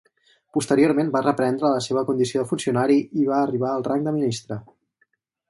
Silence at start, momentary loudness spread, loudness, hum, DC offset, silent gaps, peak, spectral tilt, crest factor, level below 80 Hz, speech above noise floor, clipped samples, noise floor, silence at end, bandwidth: 0.55 s; 8 LU; -22 LUFS; none; under 0.1%; none; -4 dBFS; -6 dB/octave; 18 dB; -64 dBFS; 47 dB; under 0.1%; -69 dBFS; 0.85 s; 11.5 kHz